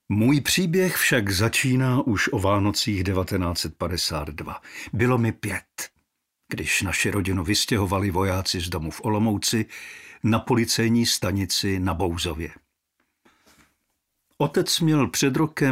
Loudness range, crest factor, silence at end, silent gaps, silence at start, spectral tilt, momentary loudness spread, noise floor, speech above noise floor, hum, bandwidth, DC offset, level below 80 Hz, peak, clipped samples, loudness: 5 LU; 18 dB; 0 s; none; 0.1 s; -4.5 dB/octave; 12 LU; -75 dBFS; 52 dB; none; 16 kHz; under 0.1%; -46 dBFS; -6 dBFS; under 0.1%; -23 LUFS